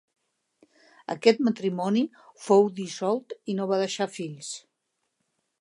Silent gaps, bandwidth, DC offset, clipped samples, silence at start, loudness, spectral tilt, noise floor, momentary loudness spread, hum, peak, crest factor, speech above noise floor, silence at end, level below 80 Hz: none; 11.5 kHz; under 0.1%; under 0.1%; 1.1 s; -26 LUFS; -5 dB/octave; -79 dBFS; 16 LU; none; -4 dBFS; 22 dB; 53 dB; 1 s; -82 dBFS